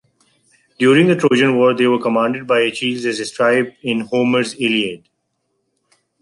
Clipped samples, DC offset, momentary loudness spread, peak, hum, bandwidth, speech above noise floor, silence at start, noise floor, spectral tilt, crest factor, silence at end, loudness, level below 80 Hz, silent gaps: under 0.1%; under 0.1%; 9 LU; -2 dBFS; none; 11.5 kHz; 55 dB; 0.8 s; -70 dBFS; -5 dB/octave; 14 dB; 1.25 s; -16 LUFS; -64 dBFS; none